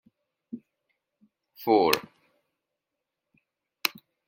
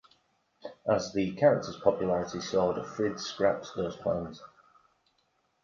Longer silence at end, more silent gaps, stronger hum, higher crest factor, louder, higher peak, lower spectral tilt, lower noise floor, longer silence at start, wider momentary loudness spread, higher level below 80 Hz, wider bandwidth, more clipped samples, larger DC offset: second, 0.4 s vs 1.2 s; neither; neither; first, 28 dB vs 22 dB; first, -26 LUFS vs -30 LUFS; first, -4 dBFS vs -10 dBFS; second, -3.5 dB/octave vs -5.5 dB/octave; first, -86 dBFS vs -74 dBFS; about the same, 0.55 s vs 0.65 s; first, 23 LU vs 12 LU; second, -76 dBFS vs -60 dBFS; first, 16.5 kHz vs 7.4 kHz; neither; neither